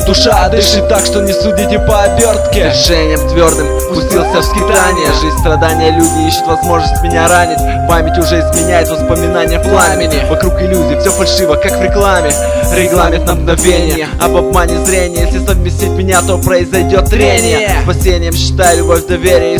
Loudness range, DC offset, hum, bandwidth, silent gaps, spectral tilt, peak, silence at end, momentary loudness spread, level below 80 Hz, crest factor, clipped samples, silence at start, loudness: 1 LU; 0.2%; none; 16 kHz; none; -4.5 dB/octave; 0 dBFS; 0 s; 4 LU; -16 dBFS; 8 dB; 0.4%; 0 s; -10 LUFS